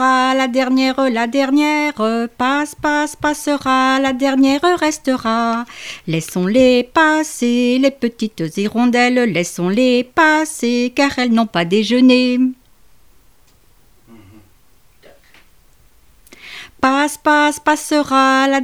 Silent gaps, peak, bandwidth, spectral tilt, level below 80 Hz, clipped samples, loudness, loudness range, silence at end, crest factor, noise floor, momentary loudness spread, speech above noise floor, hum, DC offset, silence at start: none; 0 dBFS; 15 kHz; -4 dB/octave; -52 dBFS; under 0.1%; -15 LUFS; 4 LU; 0 s; 16 dB; -53 dBFS; 7 LU; 38 dB; none; 0.3%; 0 s